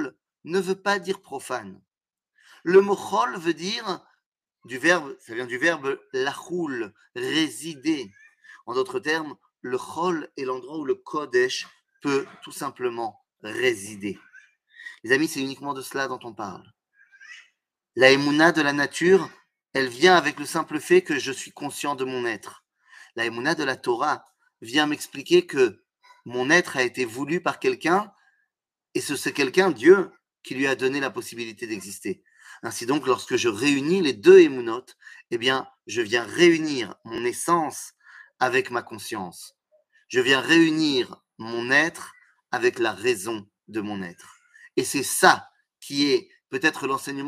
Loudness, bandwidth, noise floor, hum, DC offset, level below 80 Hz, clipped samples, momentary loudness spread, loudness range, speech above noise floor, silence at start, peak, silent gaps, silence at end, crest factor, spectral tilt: -23 LUFS; 15.5 kHz; -87 dBFS; none; under 0.1%; -74 dBFS; under 0.1%; 16 LU; 8 LU; 64 dB; 0 s; 0 dBFS; 4.26-4.32 s; 0 s; 24 dB; -4 dB/octave